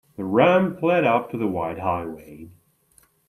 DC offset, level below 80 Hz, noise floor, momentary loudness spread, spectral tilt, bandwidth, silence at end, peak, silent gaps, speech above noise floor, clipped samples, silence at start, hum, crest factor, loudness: under 0.1%; -60 dBFS; -60 dBFS; 11 LU; -8 dB/octave; 13 kHz; 0.8 s; -4 dBFS; none; 38 dB; under 0.1%; 0.2 s; none; 20 dB; -21 LUFS